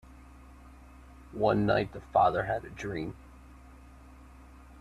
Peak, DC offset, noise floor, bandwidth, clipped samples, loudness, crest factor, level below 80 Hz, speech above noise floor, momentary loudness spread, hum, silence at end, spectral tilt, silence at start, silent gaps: -12 dBFS; under 0.1%; -52 dBFS; 13 kHz; under 0.1%; -29 LUFS; 20 dB; -52 dBFS; 23 dB; 15 LU; none; 0 s; -7 dB/octave; 0.1 s; none